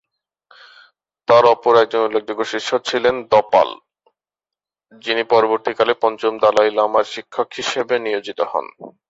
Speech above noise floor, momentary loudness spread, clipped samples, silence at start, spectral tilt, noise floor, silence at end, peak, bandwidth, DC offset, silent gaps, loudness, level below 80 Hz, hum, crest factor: 72 dB; 11 LU; under 0.1%; 1.3 s; -3.5 dB/octave; -89 dBFS; 0.2 s; -2 dBFS; 8 kHz; under 0.1%; none; -17 LUFS; -62 dBFS; none; 18 dB